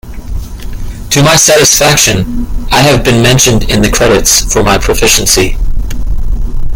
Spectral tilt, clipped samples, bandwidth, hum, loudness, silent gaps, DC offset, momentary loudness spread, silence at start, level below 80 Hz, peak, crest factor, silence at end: -3 dB/octave; 0.6%; over 20 kHz; none; -7 LUFS; none; under 0.1%; 19 LU; 0.05 s; -16 dBFS; 0 dBFS; 8 dB; 0 s